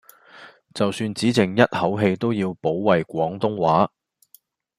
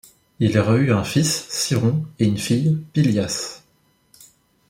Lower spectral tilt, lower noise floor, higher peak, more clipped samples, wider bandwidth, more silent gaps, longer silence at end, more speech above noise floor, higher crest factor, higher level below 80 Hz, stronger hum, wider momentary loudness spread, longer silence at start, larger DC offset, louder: about the same, -6 dB/octave vs -5.5 dB/octave; second, -57 dBFS vs -61 dBFS; about the same, -2 dBFS vs -4 dBFS; neither; about the same, 15.5 kHz vs 16.5 kHz; neither; second, 0.9 s vs 1.1 s; second, 36 dB vs 42 dB; about the same, 20 dB vs 18 dB; second, -60 dBFS vs -54 dBFS; neither; about the same, 6 LU vs 5 LU; about the same, 0.35 s vs 0.4 s; neither; about the same, -21 LUFS vs -20 LUFS